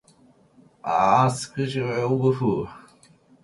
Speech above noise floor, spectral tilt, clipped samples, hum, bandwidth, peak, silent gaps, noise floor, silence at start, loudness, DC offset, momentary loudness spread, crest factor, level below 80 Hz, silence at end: 35 dB; -6.5 dB/octave; under 0.1%; none; 11.5 kHz; -6 dBFS; none; -57 dBFS; 0.85 s; -23 LUFS; under 0.1%; 11 LU; 18 dB; -58 dBFS; 0.65 s